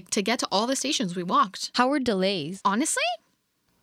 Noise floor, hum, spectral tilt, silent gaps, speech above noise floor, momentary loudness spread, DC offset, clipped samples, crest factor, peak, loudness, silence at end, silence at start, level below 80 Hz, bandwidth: -70 dBFS; none; -3 dB/octave; none; 45 dB; 3 LU; under 0.1%; under 0.1%; 18 dB; -8 dBFS; -25 LUFS; 0.65 s; 0.1 s; -68 dBFS; 16 kHz